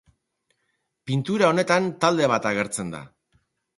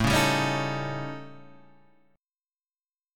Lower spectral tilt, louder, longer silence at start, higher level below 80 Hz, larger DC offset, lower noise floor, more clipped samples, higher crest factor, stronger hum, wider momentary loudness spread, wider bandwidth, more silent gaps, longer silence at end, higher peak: about the same, -5 dB/octave vs -4.5 dB/octave; first, -22 LUFS vs -27 LUFS; first, 1.05 s vs 0 s; second, -62 dBFS vs -46 dBFS; neither; second, -75 dBFS vs under -90 dBFS; neither; about the same, 20 dB vs 20 dB; neither; second, 14 LU vs 19 LU; second, 11.5 kHz vs 17.5 kHz; second, none vs 2.52-2.56 s; first, 0.7 s vs 0 s; first, -4 dBFS vs -10 dBFS